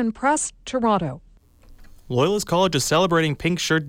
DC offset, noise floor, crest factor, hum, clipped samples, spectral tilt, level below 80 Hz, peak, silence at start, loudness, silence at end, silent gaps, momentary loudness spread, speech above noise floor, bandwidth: under 0.1%; -49 dBFS; 14 dB; none; under 0.1%; -4.5 dB/octave; -48 dBFS; -8 dBFS; 0 s; -21 LUFS; 0 s; none; 8 LU; 28 dB; 16.5 kHz